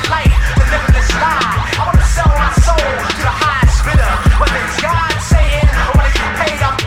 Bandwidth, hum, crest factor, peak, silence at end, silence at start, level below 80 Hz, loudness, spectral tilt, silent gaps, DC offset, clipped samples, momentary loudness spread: 15 kHz; none; 12 dB; 0 dBFS; 0 s; 0 s; -14 dBFS; -13 LUFS; -5 dB/octave; none; under 0.1%; under 0.1%; 3 LU